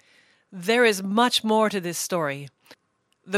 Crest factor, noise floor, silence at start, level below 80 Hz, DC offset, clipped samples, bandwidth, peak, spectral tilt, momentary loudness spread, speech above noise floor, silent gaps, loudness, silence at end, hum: 18 dB; -71 dBFS; 0.5 s; -78 dBFS; under 0.1%; under 0.1%; 16 kHz; -6 dBFS; -3.5 dB/octave; 12 LU; 48 dB; none; -22 LUFS; 0 s; none